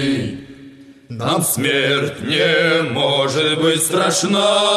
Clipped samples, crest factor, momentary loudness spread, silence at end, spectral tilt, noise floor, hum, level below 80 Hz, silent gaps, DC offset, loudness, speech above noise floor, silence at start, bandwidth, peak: under 0.1%; 14 dB; 9 LU; 0 s; -3.5 dB/octave; -41 dBFS; none; -56 dBFS; none; under 0.1%; -16 LUFS; 24 dB; 0 s; 13 kHz; -4 dBFS